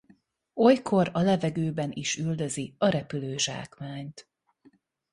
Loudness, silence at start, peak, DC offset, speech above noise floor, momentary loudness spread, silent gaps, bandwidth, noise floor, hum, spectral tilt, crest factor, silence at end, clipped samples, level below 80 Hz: -27 LUFS; 0.55 s; -8 dBFS; under 0.1%; 36 dB; 16 LU; none; 11.5 kHz; -62 dBFS; none; -5 dB/octave; 20 dB; 0.9 s; under 0.1%; -64 dBFS